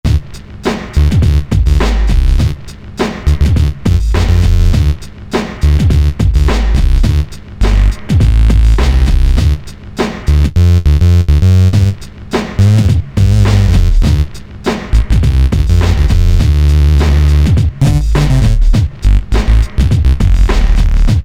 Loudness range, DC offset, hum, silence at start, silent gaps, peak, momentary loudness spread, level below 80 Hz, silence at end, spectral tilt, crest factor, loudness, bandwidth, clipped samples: 3 LU; under 0.1%; none; 0.05 s; none; 0 dBFS; 9 LU; -10 dBFS; 0 s; -7 dB/octave; 8 dB; -12 LUFS; 13 kHz; under 0.1%